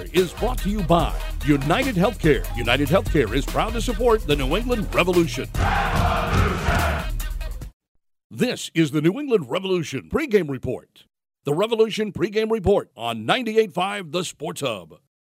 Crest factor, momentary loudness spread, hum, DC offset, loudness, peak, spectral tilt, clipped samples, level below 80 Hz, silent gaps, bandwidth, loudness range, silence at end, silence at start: 20 dB; 9 LU; none; under 0.1%; -22 LUFS; -2 dBFS; -5.5 dB/octave; under 0.1%; -30 dBFS; 7.73-7.80 s, 7.88-7.95 s, 8.24-8.30 s; 16 kHz; 3 LU; 0.25 s; 0 s